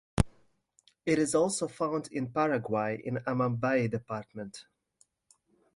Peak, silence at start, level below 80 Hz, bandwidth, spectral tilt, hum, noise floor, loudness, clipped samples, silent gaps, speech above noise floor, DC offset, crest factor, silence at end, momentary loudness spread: -8 dBFS; 0.15 s; -50 dBFS; 11.5 kHz; -5.5 dB/octave; none; -70 dBFS; -31 LUFS; under 0.1%; none; 40 dB; under 0.1%; 24 dB; 1.15 s; 12 LU